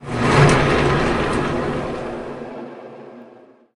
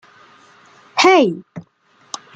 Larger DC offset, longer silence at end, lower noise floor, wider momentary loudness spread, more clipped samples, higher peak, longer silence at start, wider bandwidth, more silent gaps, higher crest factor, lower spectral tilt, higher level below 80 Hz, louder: neither; second, 0.4 s vs 0.75 s; about the same, -47 dBFS vs -48 dBFS; second, 22 LU vs 26 LU; neither; about the same, -2 dBFS vs -2 dBFS; second, 0 s vs 0.95 s; first, 11.5 kHz vs 9.2 kHz; neither; about the same, 18 dB vs 18 dB; first, -6 dB/octave vs -3.5 dB/octave; first, -34 dBFS vs -66 dBFS; second, -18 LUFS vs -14 LUFS